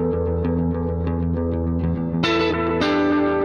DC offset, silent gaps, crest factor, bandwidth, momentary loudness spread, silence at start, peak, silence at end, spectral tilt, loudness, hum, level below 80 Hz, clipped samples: under 0.1%; none; 14 dB; 7 kHz; 4 LU; 0 s; -6 dBFS; 0 s; -7.5 dB/octave; -21 LUFS; none; -34 dBFS; under 0.1%